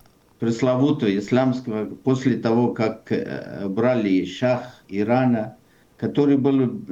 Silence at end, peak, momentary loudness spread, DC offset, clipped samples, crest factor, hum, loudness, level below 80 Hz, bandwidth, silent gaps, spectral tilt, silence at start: 0 s; -8 dBFS; 9 LU; under 0.1%; under 0.1%; 14 dB; none; -22 LUFS; -62 dBFS; 7.8 kHz; none; -7.5 dB/octave; 0.4 s